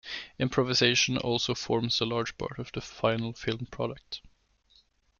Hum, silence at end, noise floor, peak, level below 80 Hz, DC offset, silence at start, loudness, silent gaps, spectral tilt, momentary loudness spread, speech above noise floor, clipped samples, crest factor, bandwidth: none; 0.95 s; -65 dBFS; -10 dBFS; -58 dBFS; under 0.1%; 0.05 s; -29 LUFS; none; -4 dB/octave; 15 LU; 36 dB; under 0.1%; 22 dB; 7.2 kHz